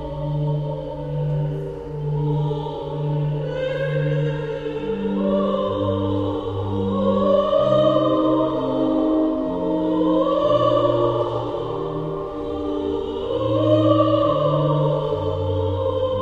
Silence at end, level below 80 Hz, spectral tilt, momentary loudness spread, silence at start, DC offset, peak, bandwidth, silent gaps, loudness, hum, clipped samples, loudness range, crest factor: 0 s; -42 dBFS; -9 dB/octave; 9 LU; 0 s; 0.1%; -4 dBFS; 7 kHz; none; -21 LUFS; none; under 0.1%; 5 LU; 18 dB